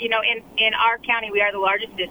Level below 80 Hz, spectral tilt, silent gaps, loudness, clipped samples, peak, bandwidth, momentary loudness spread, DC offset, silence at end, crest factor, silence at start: -56 dBFS; -3.5 dB/octave; none; -20 LUFS; under 0.1%; -6 dBFS; over 20 kHz; 4 LU; under 0.1%; 0 s; 16 dB; 0 s